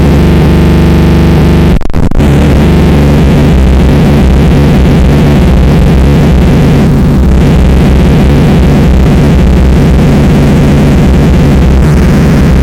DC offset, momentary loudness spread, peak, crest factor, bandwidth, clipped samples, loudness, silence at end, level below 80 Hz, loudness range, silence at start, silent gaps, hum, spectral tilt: under 0.1%; 1 LU; 0 dBFS; 4 dB; 15.5 kHz; under 0.1%; -5 LUFS; 0 s; -8 dBFS; 0 LU; 0 s; none; none; -7.5 dB/octave